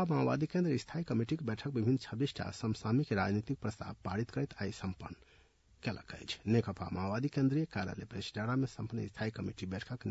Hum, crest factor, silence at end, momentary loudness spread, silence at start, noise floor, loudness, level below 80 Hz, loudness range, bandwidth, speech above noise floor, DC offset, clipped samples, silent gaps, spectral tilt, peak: none; 18 dB; 0 s; 10 LU; 0 s; -66 dBFS; -37 LUFS; -64 dBFS; 4 LU; 7.6 kHz; 30 dB; under 0.1%; under 0.1%; none; -6.5 dB/octave; -18 dBFS